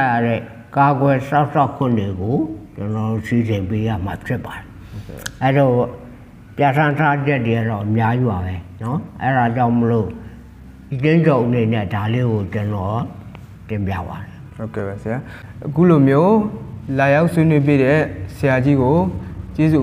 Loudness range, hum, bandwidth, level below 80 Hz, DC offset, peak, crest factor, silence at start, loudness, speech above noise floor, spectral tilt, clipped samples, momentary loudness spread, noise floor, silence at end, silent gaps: 7 LU; none; 15 kHz; -44 dBFS; under 0.1%; -2 dBFS; 16 dB; 0 s; -18 LUFS; 22 dB; -8.5 dB/octave; under 0.1%; 16 LU; -39 dBFS; 0 s; none